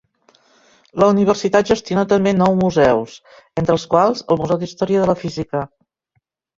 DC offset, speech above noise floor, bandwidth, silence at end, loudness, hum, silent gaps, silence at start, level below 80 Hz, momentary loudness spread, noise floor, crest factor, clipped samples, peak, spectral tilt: under 0.1%; 52 dB; 7.6 kHz; 0.9 s; -17 LUFS; none; none; 0.95 s; -48 dBFS; 10 LU; -68 dBFS; 16 dB; under 0.1%; 0 dBFS; -6.5 dB/octave